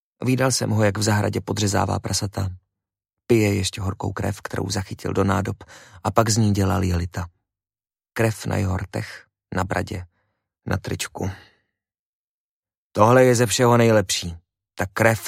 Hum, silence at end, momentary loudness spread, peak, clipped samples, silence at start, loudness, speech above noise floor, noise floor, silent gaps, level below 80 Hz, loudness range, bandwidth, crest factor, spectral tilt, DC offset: none; 0 s; 14 LU; 0 dBFS; under 0.1%; 0.2 s; -22 LUFS; over 69 dB; under -90 dBFS; 11.99-12.63 s, 12.77-12.90 s; -48 dBFS; 10 LU; 16 kHz; 22 dB; -5 dB/octave; under 0.1%